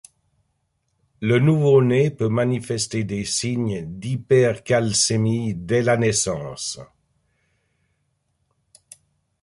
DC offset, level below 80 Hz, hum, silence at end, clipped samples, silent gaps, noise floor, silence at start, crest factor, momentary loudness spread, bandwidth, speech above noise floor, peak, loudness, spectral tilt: under 0.1%; -54 dBFS; none; 2.6 s; under 0.1%; none; -71 dBFS; 1.2 s; 18 dB; 12 LU; 11.5 kHz; 51 dB; -4 dBFS; -20 LUFS; -5 dB/octave